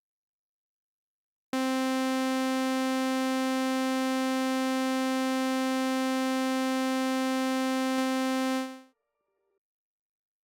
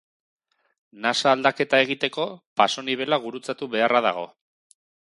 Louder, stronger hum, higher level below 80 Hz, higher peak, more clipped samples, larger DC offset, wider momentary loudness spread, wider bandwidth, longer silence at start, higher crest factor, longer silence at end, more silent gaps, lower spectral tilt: second, -28 LUFS vs -23 LUFS; neither; second, -88 dBFS vs -76 dBFS; second, -20 dBFS vs -2 dBFS; neither; neither; second, 0 LU vs 11 LU; first, 19 kHz vs 11.5 kHz; first, 1.55 s vs 0.95 s; second, 10 dB vs 22 dB; first, 1.6 s vs 0.75 s; second, none vs 2.46-2.56 s; second, -2 dB/octave vs -3.5 dB/octave